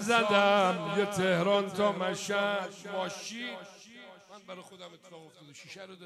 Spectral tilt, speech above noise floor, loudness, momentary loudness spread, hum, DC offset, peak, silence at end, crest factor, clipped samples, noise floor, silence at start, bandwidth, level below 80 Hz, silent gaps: -4 dB/octave; 21 dB; -29 LUFS; 25 LU; none; under 0.1%; -10 dBFS; 0 s; 20 dB; under 0.1%; -52 dBFS; 0 s; 13.5 kHz; -78 dBFS; none